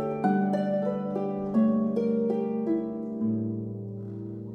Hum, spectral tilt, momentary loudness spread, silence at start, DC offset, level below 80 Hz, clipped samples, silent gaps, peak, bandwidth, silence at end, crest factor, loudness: none; -10 dB/octave; 12 LU; 0 s; under 0.1%; -64 dBFS; under 0.1%; none; -14 dBFS; 5.4 kHz; 0 s; 14 dB; -28 LUFS